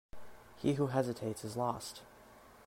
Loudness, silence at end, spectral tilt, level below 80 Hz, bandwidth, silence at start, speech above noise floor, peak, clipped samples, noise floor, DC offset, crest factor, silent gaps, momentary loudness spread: -37 LUFS; 0 s; -6 dB/octave; -64 dBFS; 16 kHz; 0.15 s; 23 dB; -18 dBFS; under 0.1%; -59 dBFS; under 0.1%; 20 dB; none; 24 LU